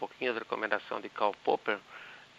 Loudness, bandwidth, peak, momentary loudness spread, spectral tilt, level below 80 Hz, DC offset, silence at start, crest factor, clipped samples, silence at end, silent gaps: -33 LUFS; 8 kHz; -12 dBFS; 9 LU; -4.5 dB/octave; -80 dBFS; under 0.1%; 0 s; 22 dB; under 0.1%; 0.15 s; none